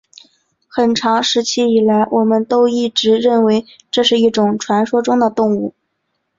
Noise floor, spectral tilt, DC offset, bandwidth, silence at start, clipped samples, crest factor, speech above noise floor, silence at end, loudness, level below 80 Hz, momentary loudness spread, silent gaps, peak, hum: -70 dBFS; -4.5 dB/octave; under 0.1%; 7.8 kHz; 0.75 s; under 0.1%; 14 dB; 56 dB; 0.7 s; -14 LUFS; -58 dBFS; 5 LU; none; -2 dBFS; none